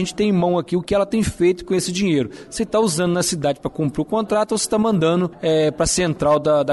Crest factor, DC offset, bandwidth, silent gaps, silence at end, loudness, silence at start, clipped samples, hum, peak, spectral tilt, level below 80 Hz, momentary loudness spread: 12 dB; under 0.1%; 12 kHz; none; 0 s; -19 LUFS; 0 s; under 0.1%; none; -8 dBFS; -5 dB/octave; -44 dBFS; 5 LU